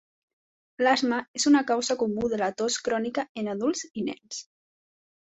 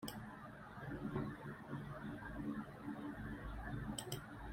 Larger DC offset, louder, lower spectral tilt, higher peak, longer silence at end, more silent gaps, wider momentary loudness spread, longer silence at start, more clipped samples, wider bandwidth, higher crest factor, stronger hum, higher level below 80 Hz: neither; first, -26 LUFS vs -48 LUFS; second, -3 dB/octave vs -5.5 dB/octave; first, -10 dBFS vs -28 dBFS; first, 0.95 s vs 0 s; first, 1.28-1.34 s, 3.29-3.35 s vs none; first, 11 LU vs 7 LU; first, 0.8 s vs 0 s; neither; second, 8.4 kHz vs 16 kHz; about the same, 18 dB vs 20 dB; neither; second, -66 dBFS vs -58 dBFS